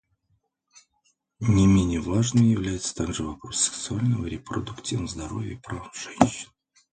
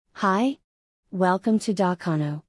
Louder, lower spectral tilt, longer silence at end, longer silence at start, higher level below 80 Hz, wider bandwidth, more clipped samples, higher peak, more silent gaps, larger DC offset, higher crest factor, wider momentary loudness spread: about the same, -25 LUFS vs -24 LUFS; about the same, -5.5 dB/octave vs -6.5 dB/octave; first, 0.45 s vs 0.1 s; first, 1.4 s vs 0.15 s; first, -42 dBFS vs -70 dBFS; second, 9.6 kHz vs 12 kHz; neither; first, 0 dBFS vs -10 dBFS; second, none vs 0.64-1.03 s; neither; first, 26 dB vs 14 dB; first, 14 LU vs 7 LU